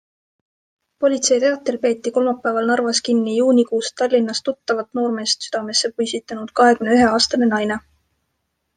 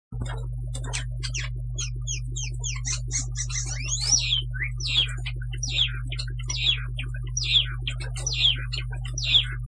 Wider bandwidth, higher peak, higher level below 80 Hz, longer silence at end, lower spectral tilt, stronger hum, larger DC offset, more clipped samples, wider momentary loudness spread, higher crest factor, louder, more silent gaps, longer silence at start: about the same, 9.8 kHz vs 10.5 kHz; first, -2 dBFS vs -8 dBFS; second, -58 dBFS vs -34 dBFS; first, 1 s vs 0 s; first, -3 dB/octave vs -1.5 dB/octave; neither; neither; neither; second, 8 LU vs 12 LU; about the same, 18 dB vs 18 dB; first, -18 LUFS vs -26 LUFS; neither; first, 1 s vs 0.1 s